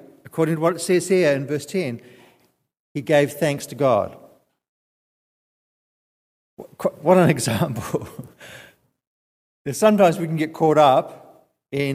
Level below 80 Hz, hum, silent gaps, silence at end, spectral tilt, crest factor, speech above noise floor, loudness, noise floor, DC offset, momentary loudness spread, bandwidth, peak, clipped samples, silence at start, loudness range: -62 dBFS; none; 2.80-2.95 s, 4.69-6.57 s, 9.07-9.65 s; 0 s; -5.5 dB/octave; 20 dB; 43 dB; -20 LUFS; -62 dBFS; under 0.1%; 19 LU; 15.5 kHz; -2 dBFS; under 0.1%; 0.25 s; 6 LU